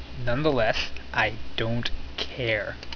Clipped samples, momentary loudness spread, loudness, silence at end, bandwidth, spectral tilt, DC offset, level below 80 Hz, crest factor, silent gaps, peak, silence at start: under 0.1%; 8 LU; -27 LUFS; 0 s; 5.4 kHz; -5.5 dB/octave; under 0.1%; -38 dBFS; 18 dB; none; -8 dBFS; 0 s